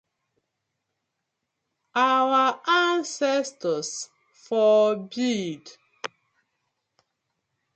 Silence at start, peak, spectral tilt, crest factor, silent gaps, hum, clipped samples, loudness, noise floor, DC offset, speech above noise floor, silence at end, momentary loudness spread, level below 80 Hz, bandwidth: 1.95 s; -10 dBFS; -3.5 dB/octave; 16 dB; none; none; under 0.1%; -23 LUFS; -81 dBFS; under 0.1%; 58 dB; 1.7 s; 18 LU; -80 dBFS; 9 kHz